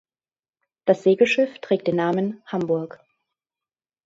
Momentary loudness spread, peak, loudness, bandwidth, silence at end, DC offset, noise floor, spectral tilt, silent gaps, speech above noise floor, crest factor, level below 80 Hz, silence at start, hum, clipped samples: 10 LU; -4 dBFS; -22 LUFS; 7.8 kHz; 1.2 s; under 0.1%; under -90 dBFS; -6.5 dB/octave; none; over 69 dB; 20 dB; -68 dBFS; 0.85 s; none; under 0.1%